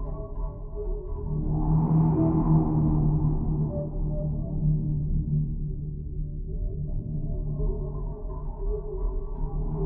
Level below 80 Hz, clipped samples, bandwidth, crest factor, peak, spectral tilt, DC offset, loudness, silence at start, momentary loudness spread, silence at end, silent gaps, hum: -30 dBFS; under 0.1%; 1.6 kHz; 14 dB; -12 dBFS; -15.5 dB/octave; under 0.1%; -28 LUFS; 0 s; 13 LU; 0 s; none; none